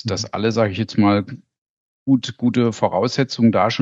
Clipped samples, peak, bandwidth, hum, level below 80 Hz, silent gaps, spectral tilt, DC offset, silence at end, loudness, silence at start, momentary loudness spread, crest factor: under 0.1%; 0 dBFS; 7.8 kHz; none; -58 dBFS; 1.58-2.06 s; -6 dB/octave; under 0.1%; 0 s; -19 LUFS; 0.05 s; 5 LU; 18 dB